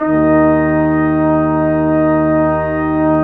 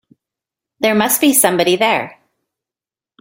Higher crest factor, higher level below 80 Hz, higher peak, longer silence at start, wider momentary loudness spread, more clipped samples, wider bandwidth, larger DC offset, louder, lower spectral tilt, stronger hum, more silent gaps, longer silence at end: second, 10 dB vs 18 dB; first, -34 dBFS vs -60 dBFS; about the same, -2 dBFS vs 0 dBFS; second, 0 s vs 0.8 s; second, 4 LU vs 8 LU; neither; second, 4 kHz vs 16.5 kHz; neither; about the same, -13 LUFS vs -13 LUFS; first, -11.5 dB/octave vs -2.5 dB/octave; neither; neither; second, 0 s vs 1.1 s